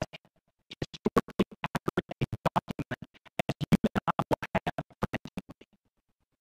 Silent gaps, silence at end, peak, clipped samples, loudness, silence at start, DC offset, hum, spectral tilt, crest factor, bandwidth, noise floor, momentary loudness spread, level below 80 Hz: 1.47-1.51 s, 4.27-4.31 s; 0.9 s; -12 dBFS; under 0.1%; -32 LUFS; 0 s; under 0.1%; none; -6.5 dB/octave; 22 dB; 16 kHz; -78 dBFS; 13 LU; -54 dBFS